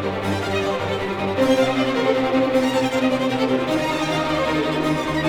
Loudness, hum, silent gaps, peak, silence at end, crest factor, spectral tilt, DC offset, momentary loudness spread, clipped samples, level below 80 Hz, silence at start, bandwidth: -20 LUFS; none; none; -6 dBFS; 0 s; 14 dB; -5.5 dB/octave; under 0.1%; 5 LU; under 0.1%; -46 dBFS; 0 s; 17 kHz